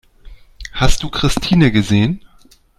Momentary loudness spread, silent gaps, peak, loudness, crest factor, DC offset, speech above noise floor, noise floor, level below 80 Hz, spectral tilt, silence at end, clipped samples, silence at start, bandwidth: 16 LU; none; 0 dBFS; -15 LUFS; 16 dB; under 0.1%; 35 dB; -48 dBFS; -24 dBFS; -5.5 dB/octave; 0.6 s; under 0.1%; 0.25 s; 13.5 kHz